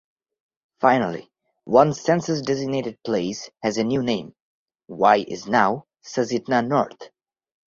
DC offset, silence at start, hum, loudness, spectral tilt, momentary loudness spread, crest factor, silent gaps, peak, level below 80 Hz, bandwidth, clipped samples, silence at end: under 0.1%; 0.8 s; none; -22 LUFS; -5.5 dB/octave; 11 LU; 22 dB; 4.42-4.66 s; 0 dBFS; -62 dBFS; 7.6 kHz; under 0.1%; 0.7 s